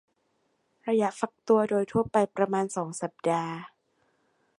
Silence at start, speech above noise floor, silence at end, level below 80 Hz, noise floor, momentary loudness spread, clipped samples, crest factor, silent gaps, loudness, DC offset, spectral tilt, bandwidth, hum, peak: 0.85 s; 46 dB; 0.95 s; -66 dBFS; -73 dBFS; 10 LU; under 0.1%; 20 dB; none; -28 LUFS; under 0.1%; -6 dB/octave; 11.5 kHz; none; -10 dBFS